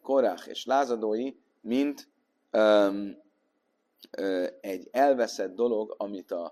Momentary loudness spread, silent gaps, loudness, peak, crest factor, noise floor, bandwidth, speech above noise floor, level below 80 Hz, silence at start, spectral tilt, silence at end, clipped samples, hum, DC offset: 14 LU; none; -28 LUFS; -10 dBFS; 18 dB; -75 dBFS; 14.5 kHz; 48 dB; -76 dBFS; 0.05 s; -4.5 dB/octave; 0 s; under 0.1%; none; under 0.1%